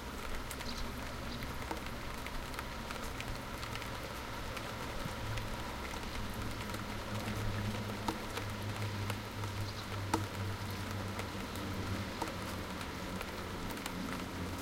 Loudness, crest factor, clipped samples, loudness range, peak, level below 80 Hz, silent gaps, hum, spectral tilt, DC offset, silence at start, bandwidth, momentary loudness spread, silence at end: -41 LUFS; 24 dB; under 0.1%; 2 LU; -16 dBFS; -48 dBFS; none; none; -4.5 dB/octave; under 0.1%; 0 s; 17 kHz; 4 LU; 0 s